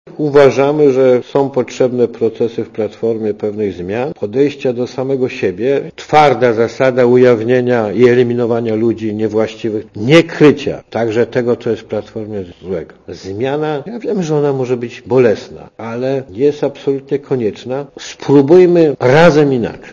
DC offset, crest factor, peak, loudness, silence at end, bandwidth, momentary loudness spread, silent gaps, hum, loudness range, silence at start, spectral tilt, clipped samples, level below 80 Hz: under 0.1%; 12 dB; 0 dBFS; -13 LUFS; 0 s; 7.4 kHz; 13 LU; none; none; 7 LU; 0.05 s; -7 dB/octave; 0.3%; -50 dBFS